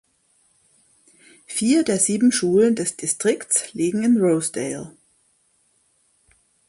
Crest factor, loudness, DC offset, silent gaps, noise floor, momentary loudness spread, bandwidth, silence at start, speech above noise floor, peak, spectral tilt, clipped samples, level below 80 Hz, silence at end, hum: 18 dB; -20 LUFS; under 0.1%; none; -64 dBFS; 11 LU; 11.5 kHz; 1.5 s; 44 dB; -4 dBFS; -4 dB/octave; under 0.1%; -64 dBFS; 1.8 s; none